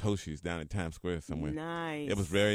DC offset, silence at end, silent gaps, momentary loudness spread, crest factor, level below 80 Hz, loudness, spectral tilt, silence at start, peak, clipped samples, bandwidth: under 0.1%; 0 s; none; 6 LU; 20 dB; -50 dBFS; -36 LUFS; -5.5 dB/octave; 0 s; -14 dBFS; under 0.1%; 15.5 kHz